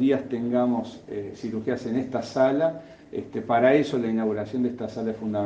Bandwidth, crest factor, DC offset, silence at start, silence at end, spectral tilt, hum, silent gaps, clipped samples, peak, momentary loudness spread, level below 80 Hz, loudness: 8 kHz; 18 dB; under 0.1%; 0 s; 0 s; -7 dB/octave; none; none; under 0.1%; -8 dBFS; 14 LU; -64 dBFS; -26 LUFS